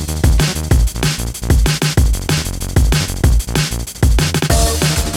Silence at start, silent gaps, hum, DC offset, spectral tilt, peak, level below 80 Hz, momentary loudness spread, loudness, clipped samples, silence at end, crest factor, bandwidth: 0 s; none; none; under 0.1%; -4.5 dB/octave; 0 dBFS; -16 dBFS; 4 LU; -15 LUFS; under 0.1%; 0 s; 12 dB; 17 kHz